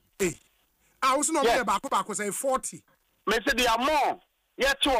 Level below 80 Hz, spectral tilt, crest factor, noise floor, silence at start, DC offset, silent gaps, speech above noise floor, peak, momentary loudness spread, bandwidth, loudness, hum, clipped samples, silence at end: -52 dBFS; -2 dB/octave; 14 dB; -67 dBFS; 0.2 s; under 0.1%; none; 42 dB; -14 dBFS; 8 LU; 15.5 kHz; -26 LUFS; none; under 0.1%; 0 s